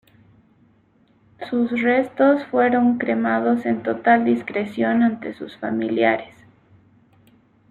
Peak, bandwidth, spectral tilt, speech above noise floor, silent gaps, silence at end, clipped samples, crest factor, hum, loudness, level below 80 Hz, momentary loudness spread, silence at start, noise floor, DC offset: -4 dBFS; 4.4 kHz; -8 dB/octave; 39 dB; none; 1.45 s; under 0.1%; 18 dB; none; -20 LUFS; -64 dBFS; 9 LU; 1.4 s; -58 dBFS; under 0.1%